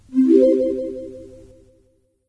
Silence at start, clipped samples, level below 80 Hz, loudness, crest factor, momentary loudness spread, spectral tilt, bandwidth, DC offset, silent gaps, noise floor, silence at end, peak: 0.1 s; under 0.1%; -54 dBFS; -17 LUFS; 18 dB; 20 LU; -8 dB/octave; 7.8 kHz; under 0.1%; none; -61 dBFS; 1.05 s; -2 dBFS